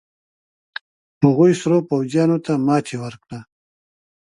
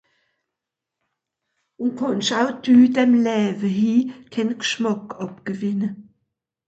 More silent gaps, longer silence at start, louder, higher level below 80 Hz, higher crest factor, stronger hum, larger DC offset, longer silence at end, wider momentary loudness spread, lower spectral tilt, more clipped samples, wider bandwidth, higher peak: neither; second, 1.2 s vs 1.8 s; about the same, -18 LUFS vs -20 LUFS; first, -62 dBFS vs -68 dBFS; about the same, 20 dB vs 16 dB; neither; neither; first, 0.9 s vs 0.65 s; first, 21 LU vs 14 LU; first, -7.5 dB/octave vs -5 dB/octave; neither; first, 11.5 kHz vs 8 kHz; first, 0 dBFS vs -4 dBFS